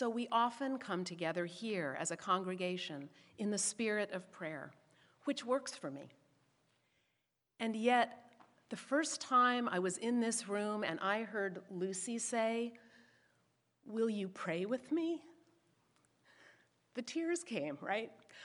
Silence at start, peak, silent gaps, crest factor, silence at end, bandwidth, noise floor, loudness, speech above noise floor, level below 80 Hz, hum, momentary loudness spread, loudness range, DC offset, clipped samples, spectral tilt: 0 s; -18 dBFS; none; 20 dB; 0 s; 11.5 kHz; -84 dBFS; -38 LUFS; 47 dB; under -90 dBFS; none; 13 LU; 7 LU; under 0.1%; under 0.1%; -3.5 dB/octave